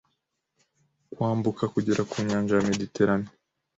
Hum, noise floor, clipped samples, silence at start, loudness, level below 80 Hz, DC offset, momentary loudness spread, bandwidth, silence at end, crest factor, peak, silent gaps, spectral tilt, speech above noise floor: none; -78 dBFS; under 0.1%; 1.1 s; -26 LUFS; -58 dBFS; under 0.1%; 5 LU; 8 kHz; 0.5 s; 18 dB; -10 dBFS; none; -6.5 dB/octave; 52 dB